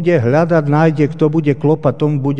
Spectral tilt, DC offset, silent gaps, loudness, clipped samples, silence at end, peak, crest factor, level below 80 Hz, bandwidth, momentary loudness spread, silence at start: -9 dB/octave; 2%; none; -14 LUFS; under 0.1%; 0 s; 0 dBFS; 14 dB; -54 dBFS; 7 kHz; 2 LU; 0 s